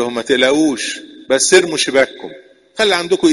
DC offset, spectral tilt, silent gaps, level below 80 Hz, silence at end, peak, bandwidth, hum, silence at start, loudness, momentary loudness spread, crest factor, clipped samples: under 0.1%; -2 dB/octave; none; -54 dBFS; 0 s; 0 dBFS; 11.5 kHz; none; 0 s; -14 LUFS; 19 LU; 14 dB; under 0.1%